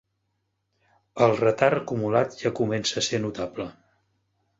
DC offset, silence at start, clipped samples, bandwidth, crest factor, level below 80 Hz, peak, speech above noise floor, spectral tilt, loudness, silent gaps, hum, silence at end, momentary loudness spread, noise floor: under 0.1%; 1.15 s; under 0.1%; 8 kHz; 22 dB; -60 dBFS; -4 dBFS; 52 dB; -4.5 dB/octave; -24 LUFS; none; none; 0.85 s; 13 LU; -76 dBFS